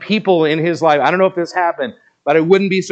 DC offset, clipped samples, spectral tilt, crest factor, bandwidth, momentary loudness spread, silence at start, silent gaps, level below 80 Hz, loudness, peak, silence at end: under 0.1%; under 0.1%; -6 dB/octave; 14 dB; 8.4 kHz; 9 LU; 0 s; none; -68 dBFS; -14 LUFS; 0 dBFS; 0 s